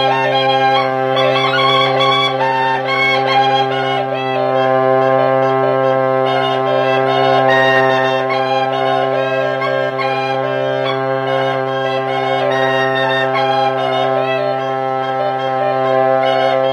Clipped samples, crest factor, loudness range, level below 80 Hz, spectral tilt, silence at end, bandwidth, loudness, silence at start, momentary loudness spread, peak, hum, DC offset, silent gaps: under 0.1%; 12 dB; 3 LU; -68 dBFS; -5.5 dB/octave; 0 s; 11.5 kHz; -14 LUFS; 0 s; 5 LU; -2 dBFS; none; under 0.1%; none